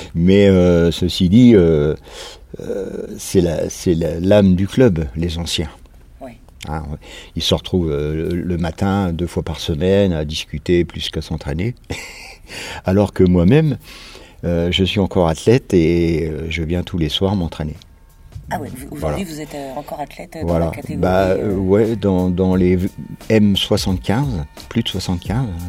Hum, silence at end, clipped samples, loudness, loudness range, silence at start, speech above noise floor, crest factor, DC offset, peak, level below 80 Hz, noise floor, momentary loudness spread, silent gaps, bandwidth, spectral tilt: none; 0 s; under 0.1%; -17 LUFS; 7 LU; 0 s; 25 dB; 16 dB; under 0.1%; 0 dBFS; -36 dBFS; -42 dBFS; 16 LU; none; 15.5 kHz; -6.5 dB/octave